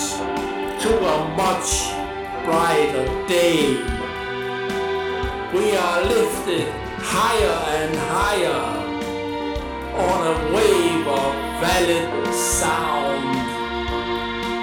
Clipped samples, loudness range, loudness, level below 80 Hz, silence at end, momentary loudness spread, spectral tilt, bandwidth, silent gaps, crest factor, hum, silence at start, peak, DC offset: under 0.1%; 2 LU; -21 LUFS; -38 dBFS; 0 s; 8 LU; -3.5 dB/octave; over 20 kHz; none; 16 dB; none; 0 s; -4 dBFS; under 0.1%